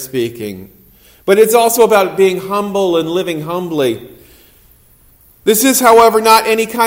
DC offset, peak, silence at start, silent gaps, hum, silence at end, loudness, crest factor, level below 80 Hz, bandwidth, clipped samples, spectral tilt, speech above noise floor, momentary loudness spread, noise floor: under 0.1%; 0 dBFS; 0 s; none; none; 0 s; -12 LUFS; 12 dB; -50 dBFS; 16.5 kHz; 0.3%; -3.5 dB/octave; 36 dB; 14 LU; -47 dBFS